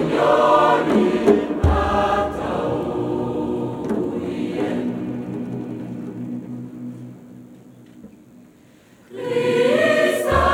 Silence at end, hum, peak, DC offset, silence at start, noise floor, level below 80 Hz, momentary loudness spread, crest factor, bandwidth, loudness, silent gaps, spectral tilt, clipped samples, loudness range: 0 s; none; -4 dBFS; under 0.1%; 0 s; -50 dBFS; -36 dBFS; 16 LU; 18 dB; 18 kHz; -20 LUFS; none; -6.5 dB/octave; under 0.1%; 15 LU